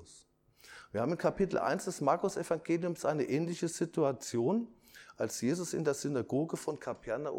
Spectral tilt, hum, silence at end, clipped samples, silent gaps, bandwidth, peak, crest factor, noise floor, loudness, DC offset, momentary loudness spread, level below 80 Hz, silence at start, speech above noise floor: -5.5 dB/octave; none; 0 s; under 0.1%; none; 17 kHz; -16 dBFS; 18 dB; -63 dBFS; -34 LUFS; under 0.1%; 8 LU; -66 dBFS; 0 s; 30 dB